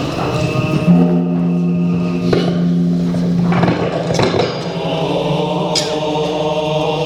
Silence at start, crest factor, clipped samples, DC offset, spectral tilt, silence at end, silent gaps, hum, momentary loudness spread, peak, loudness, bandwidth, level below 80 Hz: 0 s; 14 dB; under 0.1%; under 0.1%; -6.5 dB/octave; 0 s; none; none; 5 LU; 0 dBFS; -16 LUFS; 10.5 kHz; -42 dBFS